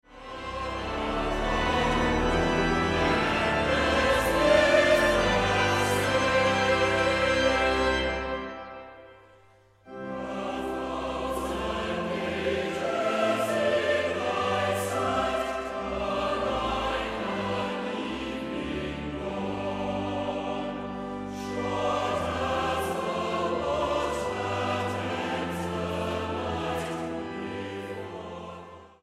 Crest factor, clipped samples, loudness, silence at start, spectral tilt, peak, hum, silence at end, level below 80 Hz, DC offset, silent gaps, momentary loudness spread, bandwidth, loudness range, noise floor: 18 dB; under 0.1%; -27 LUFS; 0.1 s; -4.5 dB/octave; -10 dBFS; none; 0.15 s; -42 dBFS; under 0.1%; none; 12 LU; 15.5 kHz; 9 LU; -58 dBFS